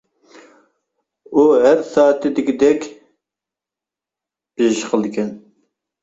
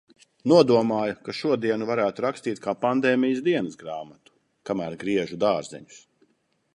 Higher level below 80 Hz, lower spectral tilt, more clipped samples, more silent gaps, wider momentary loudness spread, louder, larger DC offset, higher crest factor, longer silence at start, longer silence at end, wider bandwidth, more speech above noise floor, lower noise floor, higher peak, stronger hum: about the same, -62 dBFS vs -66 dBFS; about the same, -5 dB/octave vs -6 dB/octave; neither; neither; second, 12 LU vs 16 LU; first, -16 LUFS vs -24 LUFS; neither; second, 16 dB vs 22 dB; first, 1.3 s vs 0.45 s; second, 0.65 s vs 0.8 s; second, 8 kHz vs 11 kHz; first, 73 dB vs 44 dB; first, -87 dBFS vs -68 dBFS; about the same, -2 dBFS vs -4 dBFS; neither